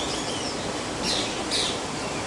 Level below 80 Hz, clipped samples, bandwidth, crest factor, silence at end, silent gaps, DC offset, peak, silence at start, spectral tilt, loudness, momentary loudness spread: -48 dBFS; under 0.1%; 11.5 kHz; 16 dB; 0 s; none; under 0.1%; -14 dBFS; 0 s; -2.5 dB/octave; -26 LUFS; 5 LU